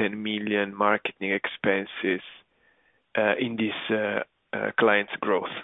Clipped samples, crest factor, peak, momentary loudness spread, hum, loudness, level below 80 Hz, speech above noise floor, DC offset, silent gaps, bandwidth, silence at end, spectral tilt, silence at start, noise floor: under 0.1%; 20 dB; -6 dBFS; 9 LU; none; -26 LUFS; -72 dBFS; 39 dB; under 0.1%; none; 4 kHz; 0 s; -8 dB/octave; 0 s; -66 dBFS